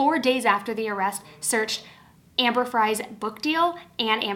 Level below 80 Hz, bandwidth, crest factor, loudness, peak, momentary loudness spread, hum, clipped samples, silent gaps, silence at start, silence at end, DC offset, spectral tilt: -68 dBFS; 17.5 kHz; 20 dB; -24 LUFS; -6 dBFS; 7 LU; none; under 0.1%; none; 0 s; 0 s; under 0.1%; -2 dB/octave